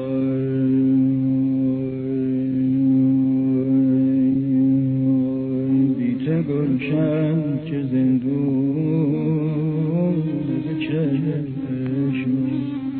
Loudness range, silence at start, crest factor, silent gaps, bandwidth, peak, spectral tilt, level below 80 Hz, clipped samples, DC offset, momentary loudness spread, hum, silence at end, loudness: 3 LU; 0 s; 10 dB; none; 4.1 kHz; -10 dBFS; -13 dB/octave; -54 dBFS; under 0.1%; under 0.1%; 6 LU; none; 0 s; -20 LUFS